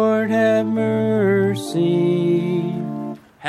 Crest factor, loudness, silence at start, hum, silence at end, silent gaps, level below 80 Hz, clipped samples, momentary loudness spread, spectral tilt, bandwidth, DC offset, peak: 12 dB; -19 LUFS; 0 s; none; 0 s; none; -64 dBFS; under 0.1%; 9 LU; -7.5 dB/octave; 13.5 kHz; under 0.1%; -6 dBFS